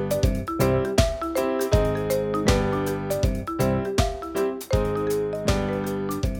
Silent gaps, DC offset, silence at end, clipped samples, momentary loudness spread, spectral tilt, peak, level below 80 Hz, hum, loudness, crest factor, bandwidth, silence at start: none; under 0.1%; 0 s; under 0.1%; 5 LU; -6 dB/octave; -6 dBFS; -32 dBFS; none; -24 LUFS; 18 dB; 19 kHz; 0 s